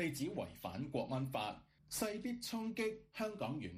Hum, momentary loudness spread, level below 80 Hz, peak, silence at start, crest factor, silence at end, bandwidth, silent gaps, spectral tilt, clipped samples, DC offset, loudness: none; 5 LU; -68 dBFS; -24 dBFS; 0 s; 18 dB; 0 s; 15.5 kHz; none; -5 dB/octave; under 0.1%; under 0.1%; -42 LUFS